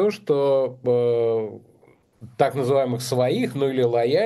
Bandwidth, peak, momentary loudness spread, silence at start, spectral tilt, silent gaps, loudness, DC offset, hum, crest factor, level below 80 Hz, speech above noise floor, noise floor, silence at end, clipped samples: 12.5 kHz; -4 dBFS; 4 LU; 0 s; -6.5 dB/octave; none; -22 LUFS; under 0.1%; none; 16 dB; -68 dBFS; 33 dB; -54 dBFS; 0 s; under 0.1%